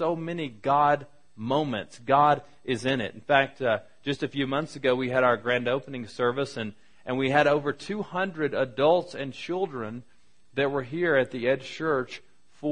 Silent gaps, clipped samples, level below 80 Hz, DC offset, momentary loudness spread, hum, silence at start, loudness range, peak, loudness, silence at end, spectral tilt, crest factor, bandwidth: none; under 0.1%; -64 dBFS; 0.3%; 13 LU; none; 0 s; 3 LU; -6 dBFS; -27 LUFS; 0 s; -6 dB/octave; 22 dB; 10.5 kHz